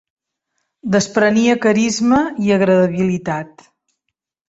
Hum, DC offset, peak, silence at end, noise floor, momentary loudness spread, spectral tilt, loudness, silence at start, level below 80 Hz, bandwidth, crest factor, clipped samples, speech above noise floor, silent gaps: none; under 0.1%; -2 dBFS; 1.05 s; -77 dBFS; 11 LU; -5.5 dB/octave; -15 LUFS; 0.85 s; -54 dBFS; 8 kHz; 16 dB; under 0.1%; 62 dB; none